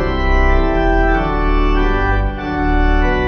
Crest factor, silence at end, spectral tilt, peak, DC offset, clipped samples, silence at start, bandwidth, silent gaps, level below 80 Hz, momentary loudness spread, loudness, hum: 12 dB; 0 s; -7.5 dB/octave; -2 dBFS; under 0.1%; under 0.1%; 0 s; 6.2 kHz; none; -16 dBFS; 3 LU; -16 LUFS; none